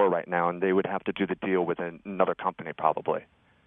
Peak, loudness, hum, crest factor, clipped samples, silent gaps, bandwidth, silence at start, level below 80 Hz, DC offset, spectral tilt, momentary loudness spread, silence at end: -6 dBFS; -28 LUFS; none; 22 dB; under 0.1%; none; 3.8 kHz; 0 s; -68 dBFS; under 0.1%; -10 dB/octave; 7 LU; 0.4 s